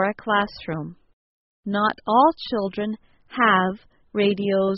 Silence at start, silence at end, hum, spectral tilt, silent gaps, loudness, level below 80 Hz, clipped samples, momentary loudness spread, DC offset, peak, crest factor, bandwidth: 0 s; 0 s; none; -3.5 dB/octave; 1.13-1.63 s; -22 LUFS; -58 dBFS; under 0.1%; 17 LU; under 0.1%; -4 dBFS; 18 dB; 5.8 kHz